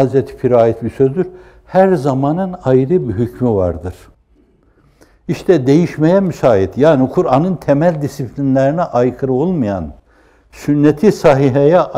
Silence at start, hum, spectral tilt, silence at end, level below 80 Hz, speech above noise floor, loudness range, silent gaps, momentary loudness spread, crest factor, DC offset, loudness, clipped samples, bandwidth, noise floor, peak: 0 s; none; -8.5 dB/octave; 0 s; -42 dBFS; 39 dB; 4 LU; none; 10 LU; 14 dB; under 0.1%; -14 LUFS; under 0.1%; 14.5 kHz; -52 dBFS; 0 dBFS